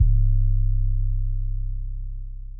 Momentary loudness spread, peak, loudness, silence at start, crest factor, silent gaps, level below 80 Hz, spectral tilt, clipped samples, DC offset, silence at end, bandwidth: 14 LU; -8 dBFS; -27 LUFS; 0 s; 12 dB; none; -22 dBFS; -26 dB/octave; under 0.1%; under 0.1%; 0 s; 0.3 kHz